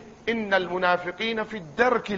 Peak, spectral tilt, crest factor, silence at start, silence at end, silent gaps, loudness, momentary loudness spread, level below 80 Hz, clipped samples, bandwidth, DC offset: -8 dBFS; -5 dB/octave; 18 dB; 0 s; 0 s; none; -25 LUFS; 7 LU; -58 dBFS; under 0.1%; 7.6 kHz; under 0.1%